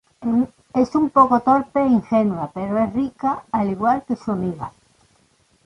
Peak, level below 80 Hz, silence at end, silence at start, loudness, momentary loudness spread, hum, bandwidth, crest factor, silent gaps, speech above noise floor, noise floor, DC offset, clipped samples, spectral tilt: -2 dBFS; -52 dBFS; 0.95 s; 0.2 s; -20 LUFS; 10 LU; none; 10.5 kHz; 18 dB; none; 41 dB; -60 dBFS; under 0.1%; under 0.1%; -8.5 dB/octave